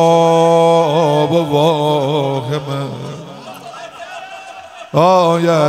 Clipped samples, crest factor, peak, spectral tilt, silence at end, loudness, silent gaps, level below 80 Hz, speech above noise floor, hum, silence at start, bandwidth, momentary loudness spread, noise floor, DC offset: under 0.1%; 14 dB; 0 dBFS; -6 dB/octave; 0 s; -13 LUFS; none; -60 dBFS; 21 dB; none; 0 s; 15 kHz; 21 LU; -33 dBFS; under 0.1%